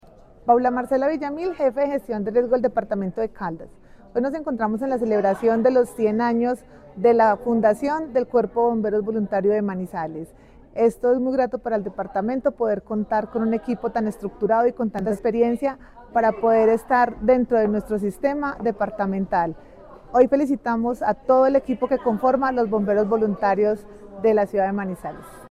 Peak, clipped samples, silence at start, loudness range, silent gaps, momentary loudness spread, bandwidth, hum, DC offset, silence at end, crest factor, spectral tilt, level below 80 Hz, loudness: -4 dBFS; under 0.1%; 0.45 s; 3 LU; none; 9 LU; 13 kHz; none; under 0.1%; 0.05 s; 18 dB; -8 dB/octave; -50 dBFS; -22 LUFS